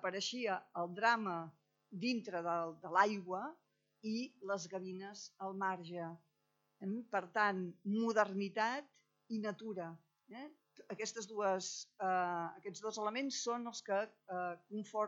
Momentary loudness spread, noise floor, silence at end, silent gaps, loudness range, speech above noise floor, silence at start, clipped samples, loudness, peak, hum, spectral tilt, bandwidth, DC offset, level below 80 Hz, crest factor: 14 LU; -82 dBFS; 0 s; none; 6 LU; 42 dB; 0 s; under 0.1%; -40 LUFS; -18 dBFS; none; -4 dB/octave; 8 kHz; under 0.1%; under -90 dBFS; 24 dB